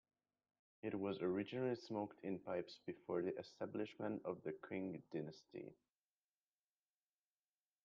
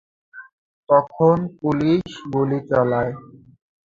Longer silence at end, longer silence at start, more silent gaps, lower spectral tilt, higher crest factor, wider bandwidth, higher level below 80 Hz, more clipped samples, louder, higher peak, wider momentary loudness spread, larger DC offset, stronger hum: first, 2.1 s vs 0.75 s; first, 0.85 s vs 0.35 s; second, none vs 0.53-0.83 s; second, -6 dB/octave vs -8.5 dB/octave; about the same, 18 dB vs 18 dB; about the same, 7.2 kHz vs 7.6 kHz; second, -86 dBFS vs -54 dBFS; neither; second, -47 LUFS vs -20 LUFS; second, -30 dBFS vs -2 dBFS; first, 10 LU vs 7 LU; neither; first, 50 Hz at -75 dBFS vs none